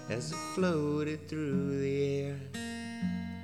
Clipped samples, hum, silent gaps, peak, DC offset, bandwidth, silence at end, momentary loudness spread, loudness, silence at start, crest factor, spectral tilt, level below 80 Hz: under 0.1%; none; none; -20 dBFS; under 0.1%; 14.5 kHz; 0 s; 8 LU; -34 LUFS; 0 s; 14 dB; -6.5 dB/octave; -66 dBFS